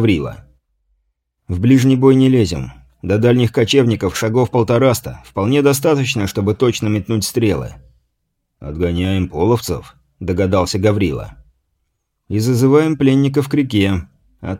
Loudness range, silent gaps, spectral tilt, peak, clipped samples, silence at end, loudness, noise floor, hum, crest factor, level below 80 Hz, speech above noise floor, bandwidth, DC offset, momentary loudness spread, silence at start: 5 LU; none; -6.5 dB/octave; 0 dBFS; under 0.1%; 0 s; -15 LUFS; -71 dBFS; none; 16 dB; -40 dBFS; 56 dB; 16.5 kHz; under 0.1%; 14 LU; 0 s